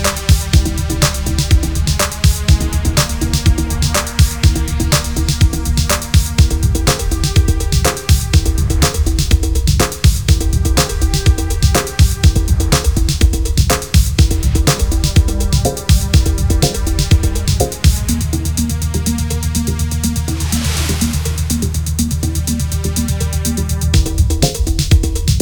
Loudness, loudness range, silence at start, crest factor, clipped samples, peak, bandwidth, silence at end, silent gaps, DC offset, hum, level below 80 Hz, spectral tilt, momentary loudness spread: -15 LUFS; 3 LU; 0 s; 14 dB; under 0.1%; 0 dBFS; over 20 kHz; 0 s; none; 1%; none; -16 dBFS; -4.5 dB/octave; 5 LU